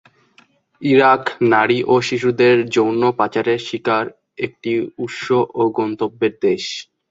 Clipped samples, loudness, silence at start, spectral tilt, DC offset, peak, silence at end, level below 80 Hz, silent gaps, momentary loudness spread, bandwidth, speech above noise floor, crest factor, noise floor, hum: under 0.1%; -17 LUFS; 0.8 s; -5.5 dB/octave; under 0.1%; -2 dBFS; 0.25 s; -60 dBFS; none; 12 LU; 7.8 kHz; 38 dB; 16 dB; -55 dBFS; none